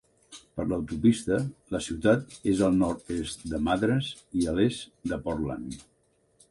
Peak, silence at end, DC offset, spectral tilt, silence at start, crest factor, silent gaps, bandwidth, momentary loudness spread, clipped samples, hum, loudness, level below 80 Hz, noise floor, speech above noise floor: -10 dBFS; 0.7 s; under 0.1%; -6 dB/octave; 0.3 s; 18 dB; none; 11.5 kHz; 10 LU; under 0.1%; none; -28 LUFS; -48 dBFS; -64 dBFS; 37 dB